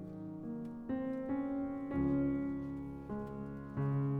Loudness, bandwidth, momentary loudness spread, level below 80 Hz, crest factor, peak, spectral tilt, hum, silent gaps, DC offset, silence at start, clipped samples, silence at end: -39 LUFS; 3.9 kHz; 10 LU; -58 dBFS; 14 dB; -24 dBFS; -11 dB/octave; none; none; under 0.1%; 0 s; under 0.1%; 0 s